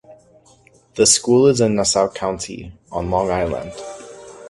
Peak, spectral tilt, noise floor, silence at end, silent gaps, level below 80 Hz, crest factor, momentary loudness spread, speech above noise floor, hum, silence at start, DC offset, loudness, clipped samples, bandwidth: 0 dBFS; -3.5 dB/octave; -52 dBFS; 0 s; none; -42 dBFS; 18 dB; 21 LU; 34 dB; none; 0.1 s; under 0.1%; -17 LUFS; under 0.1%; 11.5 kHz